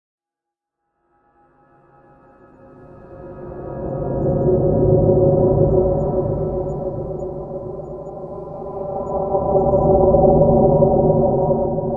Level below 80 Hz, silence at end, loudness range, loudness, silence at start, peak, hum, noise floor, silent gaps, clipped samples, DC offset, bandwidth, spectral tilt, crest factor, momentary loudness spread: -32 dBFS; 0 s; 10 LU; -17 LUFS; 2.8 s; -2 dBFS; none; -85 dBFS; none; under 0.1%; under 0.1%; 1.8 kHz; -14 dB/octave; 18 dB; 18 LU